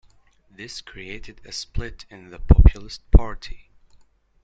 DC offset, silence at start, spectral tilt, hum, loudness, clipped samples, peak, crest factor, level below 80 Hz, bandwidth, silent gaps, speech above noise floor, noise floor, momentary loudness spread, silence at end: under 0.1%; 0.6 s; -6.5 dB/octave; none; -21 LUFS; under 0.1%; -2 dBFS; 20 dB; -22 dBFS; 7.8 kHz; none; 37 dB; -56 dBFS; 25 LU; 0.9 s